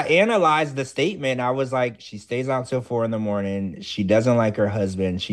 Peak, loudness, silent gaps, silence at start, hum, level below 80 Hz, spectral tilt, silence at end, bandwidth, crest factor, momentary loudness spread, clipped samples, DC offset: -6 dBFS; -22 LUFS; none; 0 s; none; -58 dBFS; -6 dB/octave; 0 s; 12 kHz; 16 dB; 9 LU; under 0.1%; under 0.1%